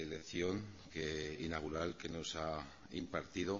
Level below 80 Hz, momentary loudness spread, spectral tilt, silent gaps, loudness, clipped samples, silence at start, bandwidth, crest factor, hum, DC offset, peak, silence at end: -60 dBFS; 7 LU; -4 dB/octave; none; -43 LUFS; under 0.1%; 0 s; 7.4 kHz; 20 dB; none; under 0.1%; -24 dBFS; 0 s